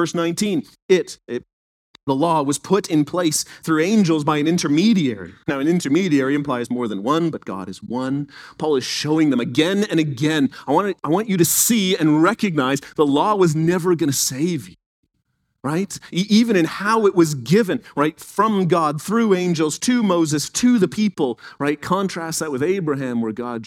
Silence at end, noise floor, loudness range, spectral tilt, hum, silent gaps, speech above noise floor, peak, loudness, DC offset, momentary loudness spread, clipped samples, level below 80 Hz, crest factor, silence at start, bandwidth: 0 s; -71 dBFS; 4 LU; -5 dB/octave; none; 0.82-0.89 s, 1.53-1.94 s, 2.03-2.07 s, 14.86-15.03 s; 52 dB; -2 dBFS; -19 LUFS; under 0.1%; 8 LU; under 0.1%; -60 dBFS; 16 dB; 0 s; 17.5 kHz